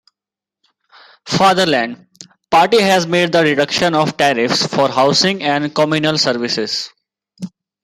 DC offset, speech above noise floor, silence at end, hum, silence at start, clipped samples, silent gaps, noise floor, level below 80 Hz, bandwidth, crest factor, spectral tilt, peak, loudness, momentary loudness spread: under 0.1%; 73 dB; 0.35 s; none; 1.25 s; under 0.1%; none; -87 dBFS; -56 dBFS; 16 kHz; 14 dB; -4 dB/octave; -2 dBFS; -14 LUFS; 13 LU